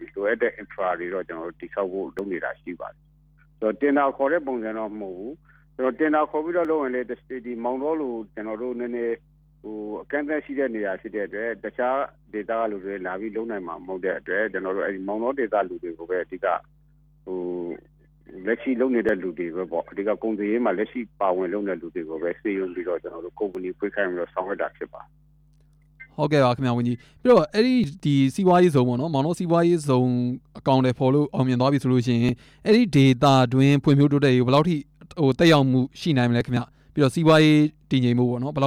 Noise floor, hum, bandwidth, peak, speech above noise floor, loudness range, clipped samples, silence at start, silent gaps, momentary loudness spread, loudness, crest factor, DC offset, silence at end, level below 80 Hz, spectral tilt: -57 dBFS; none; 13 kHz; -6 dBFS; 34 dB; 10 LU; under 0.1%; 0 s; none; 14 LU; -23 LUFS; 16 dB; under 0.1%; 0 s; -56 dBFS; -7 dB/octave